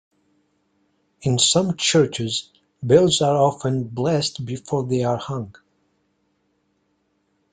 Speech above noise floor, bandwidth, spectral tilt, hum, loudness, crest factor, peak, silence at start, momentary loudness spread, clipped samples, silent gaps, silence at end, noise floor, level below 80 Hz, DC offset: 49 dB; 9.6 kHz; -4.5 dB/octave; none; -20 LUFS; 20 dB; -2 dBFS; 1.2 s; 13 LU; under 0.1%; none; 2 s; -68 dBFS; -58 dBFS; under 0.1%